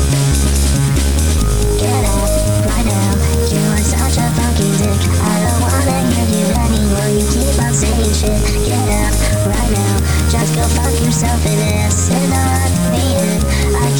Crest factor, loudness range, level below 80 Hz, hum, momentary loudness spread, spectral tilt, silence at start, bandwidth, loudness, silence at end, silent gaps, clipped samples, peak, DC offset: 12 dB; 0 LU; -18 dBFS; none; 1 LU; -5 dB/octave; 0 s; over 20 kHz; -14 LUFS; 0 s; none; under 0.1%; -2 dBFS; under 0.1%